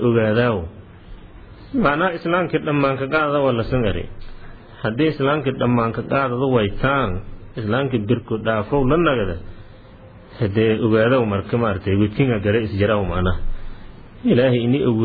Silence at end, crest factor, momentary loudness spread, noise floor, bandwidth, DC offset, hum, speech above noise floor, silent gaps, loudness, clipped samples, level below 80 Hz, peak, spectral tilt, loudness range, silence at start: 0 s; 16 dB; 10 LU; -42 dBFS; 4.9 kHz; under 0.1%; none; 24 dB; none; -19 LUFS; under 0.1%; -34 dBFS; -4 dBFS; -10.5 dB/octave; 2 LU; 0 s